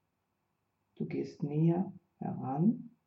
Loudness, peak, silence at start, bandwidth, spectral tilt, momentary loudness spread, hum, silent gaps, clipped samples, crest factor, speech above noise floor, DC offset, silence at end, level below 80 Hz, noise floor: -34 LUFS; -18 dBFS; 1 s; 6.2 kHz; -10.5 dB/octave; 11 LU; none; none; under 0.1%; 16 dB; 49 dB; under 0.1%; 0.2 s; -78 dBFS; -81 dBFS